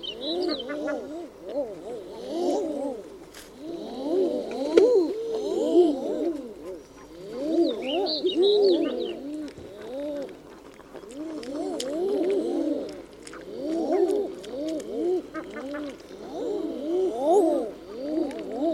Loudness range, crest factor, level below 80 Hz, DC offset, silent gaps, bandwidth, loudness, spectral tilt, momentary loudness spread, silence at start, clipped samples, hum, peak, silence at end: 7 LU; 26 dB; -62 dBFS; under 0.1%; none; 13 kHz; -27 LUFS; -4.5 dB/octave; 19 LU; 0 s; under 0.1%; none; -2 dBFS; 0 s